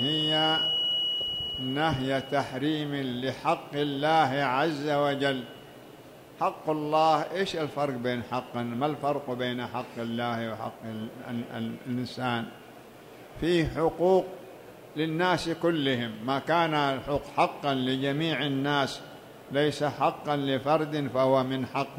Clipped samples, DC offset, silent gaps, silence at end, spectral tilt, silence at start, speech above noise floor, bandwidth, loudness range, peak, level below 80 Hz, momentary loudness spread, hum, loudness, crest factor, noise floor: under 0.1%; under 0.1%; none; 0 s; -5.5 dB/octave; 0 s; 21 dB; 16 kHz; 5 LU; -12 dBFS; -58 dBFS; 12 LU; none; -28 LUFS; 18 dB; -49 dBFS